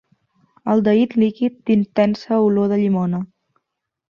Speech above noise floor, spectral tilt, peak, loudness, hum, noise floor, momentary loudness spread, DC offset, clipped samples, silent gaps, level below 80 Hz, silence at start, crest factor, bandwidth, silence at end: 62 dB; -9 dB/octave; -4 dBFS; -18 LUFS; none; -79 dBFS; 8 LU; under 0.1%; under 0.1%; none; -60 dBFS; 0.65 s; 16 dB; 6.6 kHz; 0.85 s